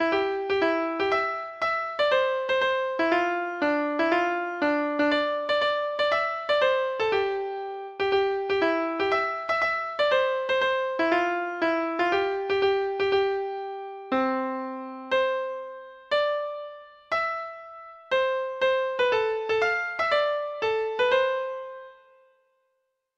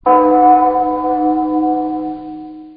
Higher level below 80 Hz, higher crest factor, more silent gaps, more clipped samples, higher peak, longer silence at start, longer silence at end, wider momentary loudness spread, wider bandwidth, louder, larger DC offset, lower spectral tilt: second, -64 dBFS vs -46 dBFS; about the same, 16 dB vs 14 dB; neither; neither; second, -10 dBFS vs 0 dBFS; about the same, 0 s vs 0.05 s; first, 1.25 s vs 0 s; second, 10 LU vs 17 LU; first, 8.2 kHz vs 4.7 kHz; second, -26 LUFS vs -13 LUFS; neither; second, -4 dB/octave vs -11 dB/octave